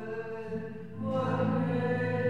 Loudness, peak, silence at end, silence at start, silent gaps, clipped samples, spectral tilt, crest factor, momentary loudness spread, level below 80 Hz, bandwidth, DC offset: -32 LUFS; -18 dBFS; 0 s; 0 s; none; under 0.1%; -9 dB/octave; 14 dB; 9 LU; -66 dBFS; 7.4 kHz; 0.4%